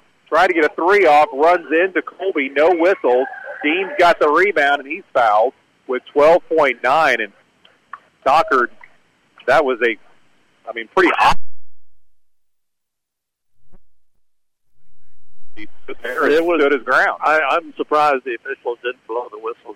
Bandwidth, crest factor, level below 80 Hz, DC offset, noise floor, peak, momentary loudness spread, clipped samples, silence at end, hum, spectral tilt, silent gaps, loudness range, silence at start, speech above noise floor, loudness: 15.5 kHz; 12 dB; -48 dBFS; under 0.1%; -82 dBFS; -4 dBFS; 13 LU; under 0.1%; 0.05 s; none; -4.5 dB/octave; none; 6 LU; 0.3 s; 66 dB; -16 LUFS